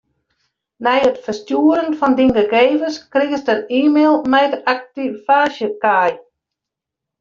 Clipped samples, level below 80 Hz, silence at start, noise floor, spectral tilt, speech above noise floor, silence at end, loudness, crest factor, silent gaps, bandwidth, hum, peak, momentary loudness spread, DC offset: under 0.1%; -54 dBFS; 0.8 s; -83 dBFS; -5 dB/octave; 68 dB; 1 s; -16 LUFS; 16 dB; none; 7.2 kHz; none; -2 dBFS; 8 LU; under 0.1%